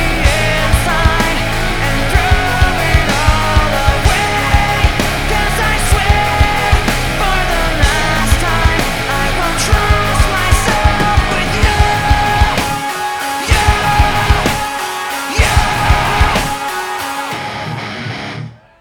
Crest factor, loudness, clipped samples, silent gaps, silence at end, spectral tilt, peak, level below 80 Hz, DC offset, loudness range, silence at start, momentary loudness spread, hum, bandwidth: 12 dB; -13 LUFS; under 0.1%; none; 0.25 s; -4 dB/octave; 0 dBFS; -18 dBFS; under 0.1%; 2 LU; 0 s; 7 LU; none; over 20 kHz